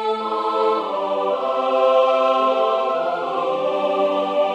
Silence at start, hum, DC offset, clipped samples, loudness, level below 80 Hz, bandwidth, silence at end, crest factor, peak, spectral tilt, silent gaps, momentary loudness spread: 0 s; none; under 0.1%; under 0.1%; -19 LUFS; -76 dBFS; 8.8 kHz; 0 s; 14 dB; -4 dBFS; -5 dB/octave; none; 6 LU